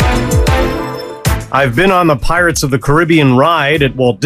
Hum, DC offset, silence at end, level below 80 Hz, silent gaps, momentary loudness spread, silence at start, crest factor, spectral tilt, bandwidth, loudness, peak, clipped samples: none; under 0.1%; 0 s; -22 dBFS; none; 8 LU; 0 s; 12 dB; -5.5 dB/octave; 15.5 kHz; -11 LUFS; 0 dBFS; under 0.1%